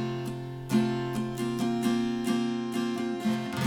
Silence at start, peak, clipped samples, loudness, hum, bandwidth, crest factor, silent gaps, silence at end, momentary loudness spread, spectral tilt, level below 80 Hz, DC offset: 0 s; -12 dBFS; under 0.1%; -30 LUFS; none; 17 kHz; 16 dB; none; 0 s; 6 LU; -6 dB/octave; -58 dBFS; under 0.1%